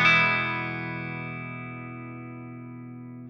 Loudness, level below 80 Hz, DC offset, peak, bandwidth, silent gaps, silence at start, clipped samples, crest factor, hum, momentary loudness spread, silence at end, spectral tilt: -27 LUFS; -68 dBFS; under 0.1%; -8 dBFS; 10 kHz; none; 0 s; under 0.1%; 20 dB; none; 20 LU; 0 s; -5.5 dB/octave